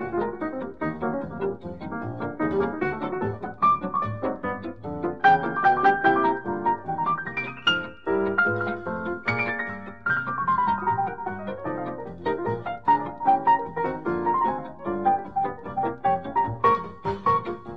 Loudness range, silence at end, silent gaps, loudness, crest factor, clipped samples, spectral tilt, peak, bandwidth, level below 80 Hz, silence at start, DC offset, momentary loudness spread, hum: 4 LU; 0 s; none; -25 LUFS; 18 dB; under 0.1%; -7 dB/octave; -8 dBFS; 7.2 kHz; -54 dBFS; 0 s; 0.4%; 11 LU; none